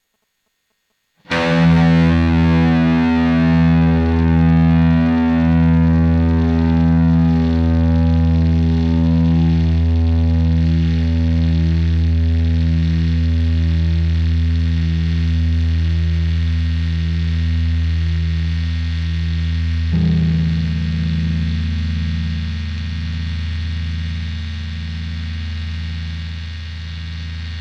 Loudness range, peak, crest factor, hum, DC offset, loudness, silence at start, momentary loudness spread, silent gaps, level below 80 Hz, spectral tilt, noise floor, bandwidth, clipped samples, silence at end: 10 LU; -6 dBFS; 10 dB; none; under 0.1%; -17 LUFS; 1.3 s; 12 LU; none; -22 dBFS; -8.5 dB/octave; -69 dBFS; 6.4 kHz; under 0.1%; 0 s